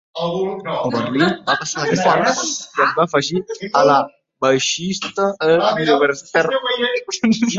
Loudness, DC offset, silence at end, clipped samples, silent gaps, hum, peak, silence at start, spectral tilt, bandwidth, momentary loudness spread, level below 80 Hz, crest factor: -17 LUFS; under 0.1%; 0 s; under 0.1%; none; none; -2 dBFS; 0.15 s; -3.5 dB/octave; 8 kHz; 7 LU; -60 dBFS; 16 dB